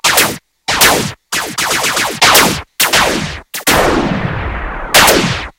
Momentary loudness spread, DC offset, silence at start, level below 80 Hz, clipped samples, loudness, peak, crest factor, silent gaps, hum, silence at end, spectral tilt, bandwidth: 12 LU; under 0.1%; 0.05 s; -30 dBFS; 0.5%; -11 LUFS; 0 dBFS; 12 dB; none; none; 0.1 s; -2 dB/octave; over 20 kHz